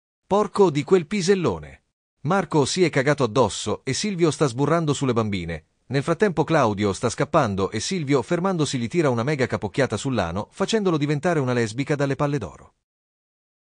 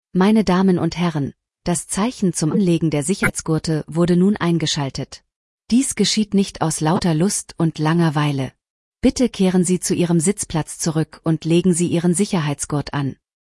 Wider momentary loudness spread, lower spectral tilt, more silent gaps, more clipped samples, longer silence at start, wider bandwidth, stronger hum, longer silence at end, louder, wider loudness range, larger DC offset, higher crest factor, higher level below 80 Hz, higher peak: about the same, 7 LU vs 7 LU; about the same, -5.5 dB/octave vs -5.5 dB/octave; second, 1.93-2.17 s vs 5.36-5.58 s, 8.70-8.92 s; neither; first, 0.3 s vs 0.15 s; second, 10 kHz vs 12 kHz; neither; first, 1.05 s vs 0.4 s; second, -22 LUFS vs -19 LUFS; about the same, 2 LU vs 1 LU; neither; about the same, 16 dB vs 14 dB; second, -52 dBFS vs -44 dBFS; about the same, -6 dBFS vs -4 dBFS